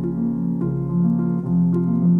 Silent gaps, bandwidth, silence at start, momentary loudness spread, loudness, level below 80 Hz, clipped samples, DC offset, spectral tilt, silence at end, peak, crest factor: none; 1.5 kHz; 0 s; 4 LU; -21 LUFS; -46 dBFS; under 0.1%; under 0.1%; -13 dB/octave; 0 s; -8 dBFS; 10 dB